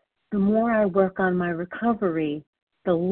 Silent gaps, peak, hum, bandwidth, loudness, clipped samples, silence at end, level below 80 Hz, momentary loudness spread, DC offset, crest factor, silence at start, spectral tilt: 2.47-2.53 s, 2.62-2.67 s; -8 dBFS; none; 4.1 kHz; -24 LUFS; under 0.1%; 0 s; -56 dBFS; 9 LU; under 0.1%; 16 dB; 0.3 s; -12 dB/octave